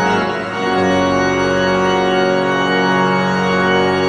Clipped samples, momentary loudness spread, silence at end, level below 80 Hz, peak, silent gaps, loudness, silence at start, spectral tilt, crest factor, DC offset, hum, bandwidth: under 0.1%; 3 LU; 0 s; -44 dBFS; -2 dBFS; none; -15 LUFS; 0 s; -5.5 dB/octave; 12 dB; under 0.1%; none; 9.4 kHz